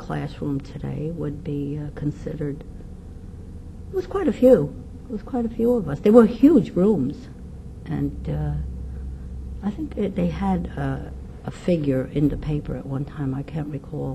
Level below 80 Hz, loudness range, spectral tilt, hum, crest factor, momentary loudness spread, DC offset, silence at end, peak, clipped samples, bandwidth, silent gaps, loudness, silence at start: -38 dBFS; 11 LU; -9 dB/octave; none; 22 dB; 22 LU; under 0.1%; 0 s; -2 dBFS; under 0.1%; 13.5 kHz; none; -23 LUFS; 0 s